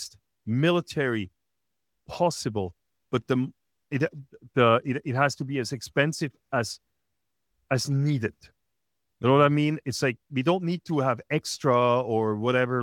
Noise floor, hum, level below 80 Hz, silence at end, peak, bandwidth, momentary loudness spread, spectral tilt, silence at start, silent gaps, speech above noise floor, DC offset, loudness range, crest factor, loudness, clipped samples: -84 dBFS; none; -66 dBFS; 0 s; -6 dBFS; 15.5 kHz; 12 LU; -6 dB/octave; 0 s; none; 59 dB; under 0.1%; 5 LU; 20 dB; -26 LUFS; under 0.1%